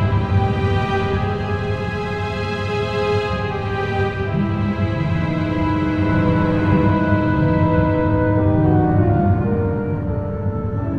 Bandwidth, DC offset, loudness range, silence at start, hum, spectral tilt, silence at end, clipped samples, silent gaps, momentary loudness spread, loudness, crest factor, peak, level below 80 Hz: 7 kHz; under 0.1%; 5 LU; 0 s; none; -8.5 dB/octave; 0 s; under 0.1%; none; 7 LU; -19 LUFS; 14 dB; -4 dBFS; -32 dBFS